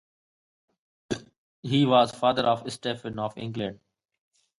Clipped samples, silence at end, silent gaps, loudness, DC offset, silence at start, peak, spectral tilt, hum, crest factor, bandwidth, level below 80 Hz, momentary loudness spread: under 0.1%; 0.85 s; 1.38-1.63 s; -26 LUFS; under 0.1%; 1.1 s; -8 dBFS; -6 dB/octave; none; 22 dB; 11.5 kHz; -62 dBFS; 14 LU